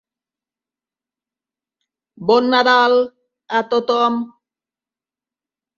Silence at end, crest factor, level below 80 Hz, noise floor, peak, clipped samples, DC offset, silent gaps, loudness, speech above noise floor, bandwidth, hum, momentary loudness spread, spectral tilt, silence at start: 1.5 s; 18 dB; -68 dBFS; under -90 dBFS; -2 dBFS; under 0.1%; under 0.1%; none; -16 LUFS; over 75 dB; 7.2 kHz; none; 13 LU; -4.5 dB/octave; 2.2 s